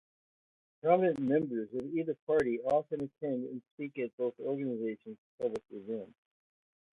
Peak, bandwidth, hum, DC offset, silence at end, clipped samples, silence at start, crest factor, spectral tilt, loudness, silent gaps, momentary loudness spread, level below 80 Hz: -14 dBFS; 10.5 kHz; none; under 0.1%; 0.85 s; under 0.1%; 0.85 s; 20 dB; -8.5 dB/octave; -34 LUFS; 2.22-2.27 s, 3.71-3.78 s, 4.13-4.18 s, 5.18-5.38 s; 13 LU; -72 dBFS